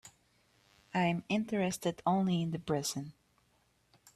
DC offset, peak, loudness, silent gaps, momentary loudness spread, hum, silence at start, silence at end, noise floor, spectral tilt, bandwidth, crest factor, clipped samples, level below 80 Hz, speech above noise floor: under 0.1%; -18 dBFS; -34 LUFS; none; 7 LU; none; 0.05 s; 1.05 s; -72 dBFS; -5.5 dB/octave; 14 kHz; 18 dB; under 0.1%; -70 dBFS; 39 dB